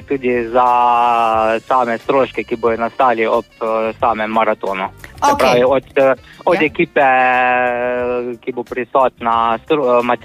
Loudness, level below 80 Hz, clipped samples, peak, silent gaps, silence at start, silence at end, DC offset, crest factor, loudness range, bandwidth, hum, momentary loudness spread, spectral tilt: -15 LUFS; -48 dBFS; under 0.1%; -2 dBFS; none; 0 s; 0.05 s; under 0.1%; 14 dB; 2 LU; 15.5 kHz; none; 8 LU; -5 dB/octave